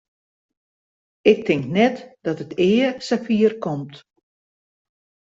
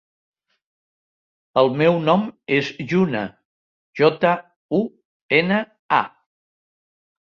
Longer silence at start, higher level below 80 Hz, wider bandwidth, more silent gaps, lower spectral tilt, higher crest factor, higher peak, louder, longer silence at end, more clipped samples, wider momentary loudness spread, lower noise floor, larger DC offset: second, 1.25 s vs 1.55 s; about the same, -62 dBFS vs -64 dBFS; about the same, 7.8 kHz vs 7.2 kHz; second, none vs 3.45-3.93 s, 4.56-4.69 s, 5.05-5.29 s, 5.79-5.89 s; about the same, -6.5 dB/octave vs -7 dB/octave; about the same, 20 dB vs 20 dB; about the same, -2 dBFS vs -2 dBFS; about the same, -20 LUFS vs -20 LUFS; first, 1.35 s vs 1.2 s; neither; about the same, 11 LU vs 10 LU; about the same, under -90 dBFS vs under -90 dBFS; neither